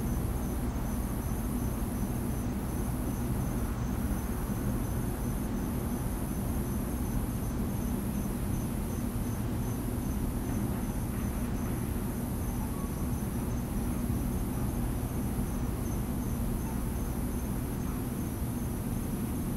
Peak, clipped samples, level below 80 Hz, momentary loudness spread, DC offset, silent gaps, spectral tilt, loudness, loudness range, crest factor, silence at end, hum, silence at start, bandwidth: -18 dBFS; under 0.1%; -38 dBFS; 1 LU; under 0.1%; none; -6.5 dB/octave; -34 LUFS; 1 LU; 14 dB; 0 s; 60 Hz at -40 dBFS; 0 s; 16 kHz